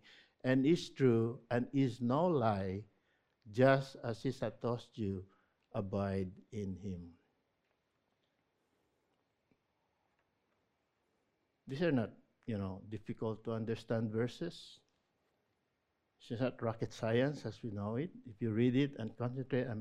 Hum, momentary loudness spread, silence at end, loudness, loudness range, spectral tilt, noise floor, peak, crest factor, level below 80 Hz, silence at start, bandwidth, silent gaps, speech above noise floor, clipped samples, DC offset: none; 14 LU; 0 s; -37 LUFS; 10 LU; -7.5 dB/octave; -83 dBFS; -14 dBFS; 24 dB; -70 dBFS; 0.45 s; 11 kHz; none; 47 dB; under 0.1%; under 0.1%